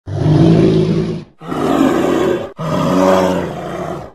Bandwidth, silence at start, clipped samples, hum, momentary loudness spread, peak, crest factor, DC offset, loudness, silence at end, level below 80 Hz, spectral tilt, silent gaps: 13 kHz; 0.05 s; under 0.1%; none; 13 LU; 0 dBFS; 14 dB; 0.4%; -14 LUFS; 0.05 s; -40 dBFS; -7.5 dB/octave; none